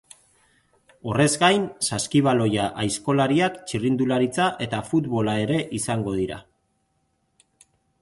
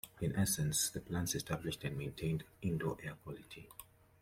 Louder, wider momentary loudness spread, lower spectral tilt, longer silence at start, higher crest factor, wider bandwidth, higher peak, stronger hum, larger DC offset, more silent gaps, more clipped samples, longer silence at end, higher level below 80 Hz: first, -23 LUFS vs -38 LUFS; second, 8 LU vs 17 LU; about the same, -5 dB/octave vs -4 dB/octave; first, 1.05 s vs 0.05 s; about the same, 18 dB vs 18 dB; second, 12 kHz vs 16.5 kHz; first, -6 dBFS vs -22 dBFS; neither; neither; neither; neither; first, 1.6 s vs 0.4 s; first, -54 dBFS vs -60 dBFS